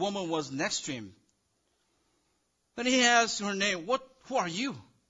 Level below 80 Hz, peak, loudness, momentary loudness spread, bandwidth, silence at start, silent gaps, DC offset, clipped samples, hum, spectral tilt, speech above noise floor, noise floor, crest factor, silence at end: -70 dBFS; -12 dBFS; -29 LUFS; 13 LU; 10 kHz; 0 s; none; under 0.1%; under 0.1%; none; -2.5 dB/octave; 46 dB; -75 dBFS; 20 dB; 0.25 s